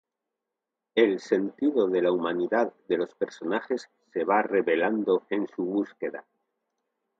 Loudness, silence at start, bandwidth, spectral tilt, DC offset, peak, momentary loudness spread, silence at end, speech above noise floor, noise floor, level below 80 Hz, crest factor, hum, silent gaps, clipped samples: -27 LUFS; 0.95 s; 7.8 kHz; -6 dB/octave; under 0.1%; -8 dBFS; 9 LU; 1 s; 61 dB; -87 dBFS; -76 dBFS; 20 dB; none; none; under 0.1%